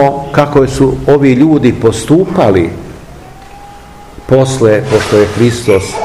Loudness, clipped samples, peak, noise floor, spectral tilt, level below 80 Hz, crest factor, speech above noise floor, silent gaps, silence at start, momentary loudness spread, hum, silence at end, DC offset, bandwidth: -9 LUFS; 3%; 0 dBFS; -32 dBFS; -6.5 dB/octave; -32 dBFS; 10 dB; 23 dB; none; 0 s; 5 LU; none; 0 s; 0.7%; 14.5 kHz